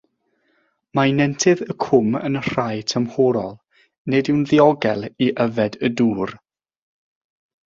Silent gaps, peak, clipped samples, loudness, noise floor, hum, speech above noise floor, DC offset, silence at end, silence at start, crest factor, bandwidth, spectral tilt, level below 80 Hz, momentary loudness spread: 3.98-4.05 s; -2 dBFS; under 0.1%; -19 LUFS; -67 dBFS; none; 48 dB; under 0.1%; 1.3 s; 0.95 s; 18 dB; 7.8 kHz; -5.5 dB/octave; -58 dBFS; 8 LU